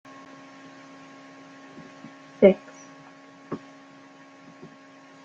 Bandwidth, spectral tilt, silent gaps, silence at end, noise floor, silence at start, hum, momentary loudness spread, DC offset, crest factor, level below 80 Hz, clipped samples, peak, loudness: 7.6 kHz; -7.5 dB/octave; none; 1.7 s; -50 dBFS; 2.4 s; none; 30 LU; under 0.1%; 26 dB; -70 dBFS; under 0.1%; -2 dBFS; -23 LUFS